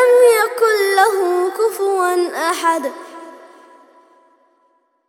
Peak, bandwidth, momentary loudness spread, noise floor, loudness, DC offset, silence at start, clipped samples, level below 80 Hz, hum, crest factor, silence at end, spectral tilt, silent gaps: 0 dBFS; 17.5 kHz; 15 LU; -61 dBFS; -15 LUFS; under 0.1%; 0 s; under 0.1%; -76 dBFS; none; 16 dB; 1.7 s; -0.5 dB/octave; none